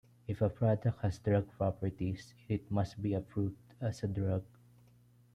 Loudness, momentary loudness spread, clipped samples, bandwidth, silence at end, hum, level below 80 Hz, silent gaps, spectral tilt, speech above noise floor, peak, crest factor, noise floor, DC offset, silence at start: -36 LUFS; 8 LU; under 0.1%; 9.6 kHz; 0.9 s; 60 Hz at -55 dBFS; -60 dBFS; none; -8.5 dB/octave; 30 dB; -18 dBFS; 18 dB; -64 dBFS; under 0.1%; 0.3 s